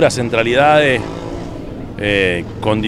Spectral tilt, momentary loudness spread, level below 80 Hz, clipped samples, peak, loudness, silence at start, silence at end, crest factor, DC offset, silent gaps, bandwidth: -5 dB/octave; 17 LU; -36 dBFS; under 0.1%; 0 dBFS; -14 LUFS; 0 s; 0 s; 14 dB; under 0.1%; none; 13.5 kHz